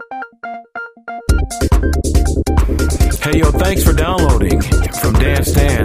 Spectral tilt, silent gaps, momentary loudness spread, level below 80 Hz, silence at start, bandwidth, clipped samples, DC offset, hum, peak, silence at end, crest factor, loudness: -5.5 dB/octave; none; 14 LU; -16 dBFS; 0 s; 15.5 kHz; under 0.1%; under 0.1%; none; 0 dBFS; 0 s; 14 dB; -14 LUFS